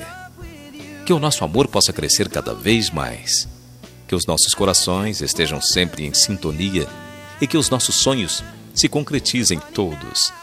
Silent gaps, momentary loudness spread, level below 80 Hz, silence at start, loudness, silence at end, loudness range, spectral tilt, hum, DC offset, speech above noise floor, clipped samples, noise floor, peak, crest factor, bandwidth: none; 15 LU; -42 dBFS; 0 s; -18 LUFS; 0 s; 1 LU; -3 dB/octave; none; under 0.1%; 23 dB; under 0.1%; -42 dBFS; 0 dBFS; 20 dB; 16 kHz